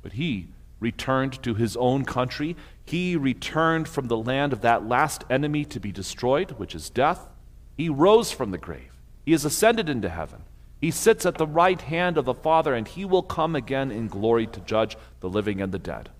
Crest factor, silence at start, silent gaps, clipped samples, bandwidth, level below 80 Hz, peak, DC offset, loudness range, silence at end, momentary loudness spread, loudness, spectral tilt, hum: 18 dB; 0.05 s; none; under 0.1%; 16 kHz; -46 dBFS; -6 dBFS; under 0.1%; 3 LU; 0.1 s; 12 LU; -24 LUFS; -5 dB/octave; none